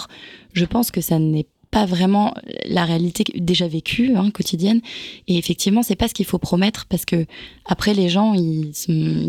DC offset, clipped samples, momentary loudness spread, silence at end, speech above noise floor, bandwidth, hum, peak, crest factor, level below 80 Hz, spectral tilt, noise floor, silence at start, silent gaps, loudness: under 0.1%; under 0.1%; 8 LU; 0 s; 23 dB; 17.5 kHz; none; -6 dBFS; 14 dB; -44 dBFS; -5.5 dB/octave; -42 dBFS; 0 s; none; -19 LUFS